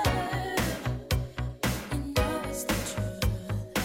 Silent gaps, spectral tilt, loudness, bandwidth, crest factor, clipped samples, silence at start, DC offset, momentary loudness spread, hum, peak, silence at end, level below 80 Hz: none; -4.5 dB/octave; -31 LUFS; 16.5 kHz; 18 dB; under 0.1%; 0 s; under 0.1%; 4 LU; none; -12 dBFS; 0 s; -38 dBFS